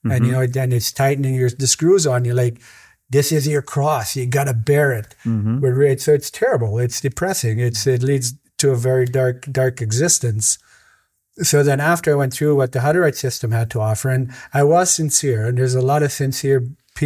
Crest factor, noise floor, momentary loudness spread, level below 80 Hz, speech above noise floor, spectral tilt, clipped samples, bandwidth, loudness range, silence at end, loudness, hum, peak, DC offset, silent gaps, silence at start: 16 dB; -59 dBFS; 6 LU; -50 dBFS; 41 dB; -5 dB/octave; under 0.1%; 16 kHz; 2 LU; 0 s; -18 LUFS; none; -2 dBFS; under 0.1%; none; 0.05 s